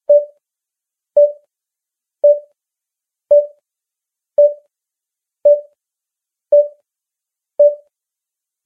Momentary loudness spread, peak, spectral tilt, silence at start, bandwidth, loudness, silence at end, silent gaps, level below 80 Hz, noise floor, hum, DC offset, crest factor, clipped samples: 16 LU; -2 dBFS; -6.5 dB/octave; 0.1 s; 1.2 kHz; -15 LUFS; 0.9 s; none; -74 dBFS; -85 dBFS; none; under 0.1%; 16 dB; under 0.1%